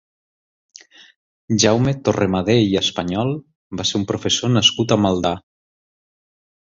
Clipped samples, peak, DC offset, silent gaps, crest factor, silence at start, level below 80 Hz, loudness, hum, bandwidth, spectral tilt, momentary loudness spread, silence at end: under 0.1%; -2 dBFS; under 0.1%; 3.55-3.70 s; 18 dB; 1.5 s; -46 dBFS; -18 LUFS; none; 7.8 kHz; -4.5 dB/octave; 9 LU; 1.3 s